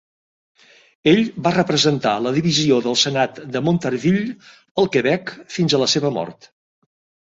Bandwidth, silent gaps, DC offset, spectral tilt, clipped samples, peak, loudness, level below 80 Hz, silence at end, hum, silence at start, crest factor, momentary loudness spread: 8 kHz; 4.71-4.75 s; under 0.1%; -4.5 dB/octave; under 0.1%; -2 dBFS; -18 LUFS; -58 dBFS; 0.95 s; none; 1.05 s; 18 dB; 9 LU